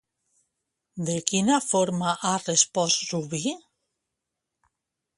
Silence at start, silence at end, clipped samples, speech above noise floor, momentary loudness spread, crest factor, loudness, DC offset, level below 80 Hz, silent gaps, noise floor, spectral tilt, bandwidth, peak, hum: 0.95 s; 1.6 s; under 0.1%; 59 dB; 11 LU; 26 dB; -24 LUFS; under 0.1%; -68 dBFS; none; -84 dBFS; -3 dB/octave; 11.5 kHz; -2 dBFS; none